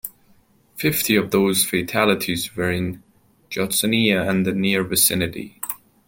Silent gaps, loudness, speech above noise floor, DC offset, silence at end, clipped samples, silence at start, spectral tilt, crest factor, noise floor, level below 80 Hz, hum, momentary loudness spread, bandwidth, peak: none; -20 LUFS; 36 dB; under 0.1%; 0.3 s; under 0.1%; 0.05 s; -3.5 dB/octave; 20 dB; -57 dBFS; -54 dBFS; none; 12 LU; 17 kHz; -2 dBFS